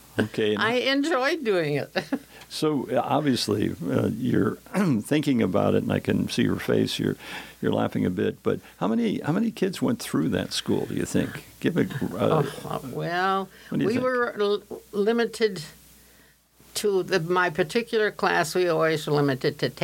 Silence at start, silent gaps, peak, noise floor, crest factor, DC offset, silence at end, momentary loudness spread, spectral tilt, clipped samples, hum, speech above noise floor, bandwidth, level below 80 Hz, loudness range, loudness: 0.15 s; none; -8 dBFS; -57 dBFS; 18 dB; under 0.1%; 0 s; 7 LU; -5.5 dB/octave; under 0.1%; none; 32 dB; 17 kHz; -58 dBFS; 2 LU; -25 LUFS